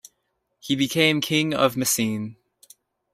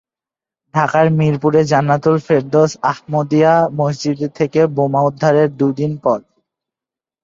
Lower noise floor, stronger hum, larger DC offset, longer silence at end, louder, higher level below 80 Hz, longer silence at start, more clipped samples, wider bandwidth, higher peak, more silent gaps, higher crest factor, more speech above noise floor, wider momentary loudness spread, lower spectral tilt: second, -75 dBFS vs -89 dBFS; neither; neither; second, 0.8 s vs 1.05 s; second, -22 LUFS vs -15 LUFS; second, -62 dBFS vs -56 dBFS; about the same, 0.65 s vs 0.75 s; neither; first, 16 kHz vs 7.6 kHz; about the same, -4 dBFS vs -2 dBFS; neither; first, 20 dB vs 14 dB; second, 53 dB vs 75 dB; first, 13 LU vs 6 LU; second, -3.5 dB/octave vs -7 dB/octave